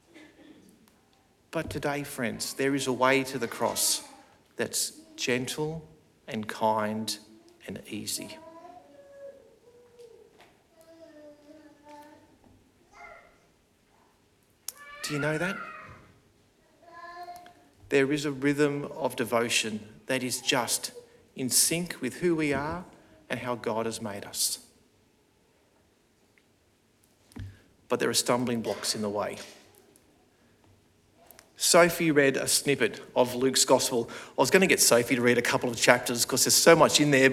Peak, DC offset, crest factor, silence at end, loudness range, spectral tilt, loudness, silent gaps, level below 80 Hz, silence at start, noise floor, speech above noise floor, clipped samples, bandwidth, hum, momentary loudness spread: 0 dBFS; under 0.1%; 28 dB; 0 s; 13 LU; -3 dB/octave; -26 LUFS; none; -64 dBFS; 0.15 s; -66 dBFS; 40 dB; under 0.1%; 17.5 kHz; none; 22 LU